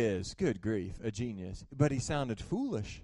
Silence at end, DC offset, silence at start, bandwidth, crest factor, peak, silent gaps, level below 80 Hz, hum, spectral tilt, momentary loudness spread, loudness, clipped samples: 0 s; under 0.1%; 0 s; 11.5 kHz; 20 dB; -14 dBFS; none; -52 dBFS; none; -6 dB/octave; 8 LU; -35 LUFS; under 0.1%